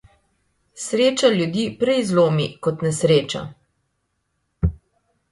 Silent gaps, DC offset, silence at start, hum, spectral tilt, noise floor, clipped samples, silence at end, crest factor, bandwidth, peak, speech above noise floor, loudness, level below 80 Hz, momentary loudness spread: none; under 0.1%; 0.75 s; none; -5.5 dB/octave; -72 dBFS; under 0.1%; 0.55 s; 20 dB; 11.5 kHz; -2 dBFS; 53 dB; -20 LUFS; -40 dBFS; 11 LU